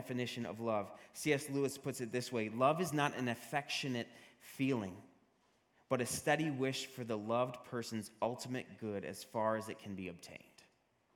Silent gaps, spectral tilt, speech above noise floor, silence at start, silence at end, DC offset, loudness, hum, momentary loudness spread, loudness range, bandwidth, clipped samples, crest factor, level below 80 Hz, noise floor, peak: none; -4.5 dB/octave; 36 dB; 0 s; 0.8 s; under 0.1%; -39 LUFS; none; 12 LU; 4 LU; 17.5 kHz; under 0.1%; 22 dB; -80 dBFS; -75 dBFS; -16 dBFS